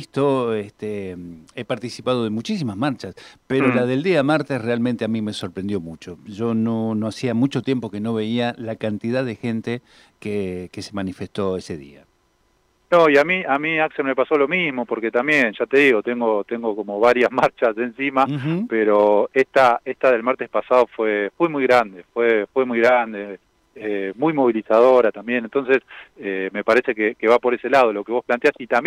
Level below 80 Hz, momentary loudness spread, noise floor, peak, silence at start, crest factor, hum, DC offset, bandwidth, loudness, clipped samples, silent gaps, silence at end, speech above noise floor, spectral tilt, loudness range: -62 dBFS; 13 LU; -63 dBFS; -4 dBFS; 0 s; 16 dB; none; under 0.1%; 12 kHz; -20 LUFS; under 0.1%; none; 0 s; 43 dB; -6.5 dB/octave; 7 LU